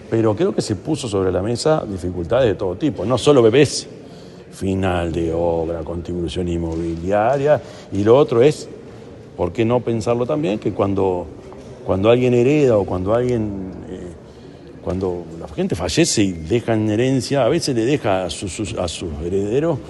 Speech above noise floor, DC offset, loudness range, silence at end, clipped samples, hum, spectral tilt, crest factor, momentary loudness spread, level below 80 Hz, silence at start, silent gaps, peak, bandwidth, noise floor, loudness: 21 dB; under 0.1%; 4 LU; 0 s; under 0.1%; none; -6 dB/octave; 18 dB; 17 LU; -42 dBFS; 0 s; none; 0 dBFS; 11.5 kHz; -39 dBFS; -19 LUFS